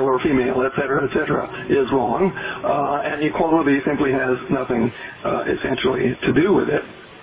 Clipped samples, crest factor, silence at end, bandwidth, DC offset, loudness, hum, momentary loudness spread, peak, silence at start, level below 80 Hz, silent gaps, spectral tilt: under 0.1%; 14 dB; 0 s; 4 kHz; under 0.1%; -20 LUFS; none; 6 LU; -6 dBFS; 0 s; -46 dBFS; none; -10.5 dB/octave